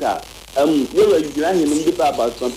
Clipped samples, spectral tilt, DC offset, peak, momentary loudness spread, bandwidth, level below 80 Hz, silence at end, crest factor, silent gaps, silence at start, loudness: under 0.1%; -4.5 dB/octave; under 0.1%; -6 dBFS; 8 LU; 16 kHz; -46 dBFS; 0 s; 12 dB; none; 0 s; -18 LUFS